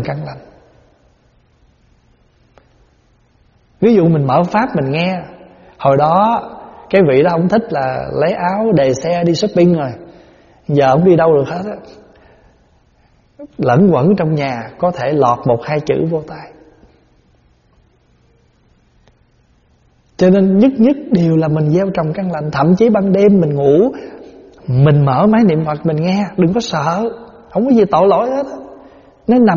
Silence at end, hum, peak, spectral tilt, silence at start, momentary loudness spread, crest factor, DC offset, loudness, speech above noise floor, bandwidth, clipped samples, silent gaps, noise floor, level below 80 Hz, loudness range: 0 s; none; 0 dBFS; -7 dB/octave; 0 s; 14 LU; 14 dB; under 0.1%; -13 LUFS; 41 dB; 7.2 kHz; under 0.1%; none; -53 dBFS; -48 dBFS; 6 LU